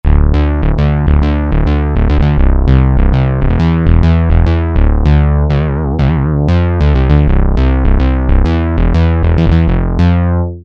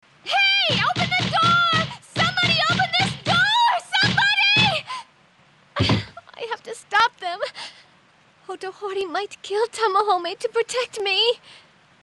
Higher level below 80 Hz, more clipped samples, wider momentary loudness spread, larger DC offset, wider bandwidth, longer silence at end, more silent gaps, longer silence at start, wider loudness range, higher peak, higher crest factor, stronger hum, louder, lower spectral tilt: first, -12 dBFS vs -52 dBFS; neither; second, 3 LU vs 16 LU; neither; second, 5.6 kHz vs 12 kHz; second, 0 s vs 0.5 s; neither; second, 0.05 s vs 0.25 s; second, 1 LU vs 8 LU; first, 0 dBFS vs -6 dBFS; second, 8 dB vs 16 dB; neither; first, -12 LUFS vs -20 LUFS; first, -9.5 dB/octave vs -3.5 dB/octave